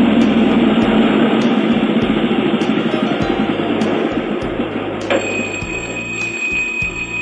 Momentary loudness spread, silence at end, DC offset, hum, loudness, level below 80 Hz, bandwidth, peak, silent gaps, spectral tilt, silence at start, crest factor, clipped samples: 8 LU; 0 s; under 0.1%; none; -16 LUFS; -40 dBFS; 8.6 kHz; -2 dBFS; none; -5.5 dB/octave; 0 s; 14 dB; under 0.1%